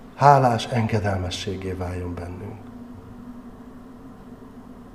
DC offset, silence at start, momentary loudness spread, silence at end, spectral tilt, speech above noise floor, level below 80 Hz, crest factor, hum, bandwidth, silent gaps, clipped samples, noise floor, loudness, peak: 0.1%; 0 s; 26 LU; 0 s; -6.5 dB/octave; 21 dB; -48 dBFS; 24 dB; none; 14 kHz; none; under 0.1%; -42 dBFS; -22 LUFS; -2 dBFS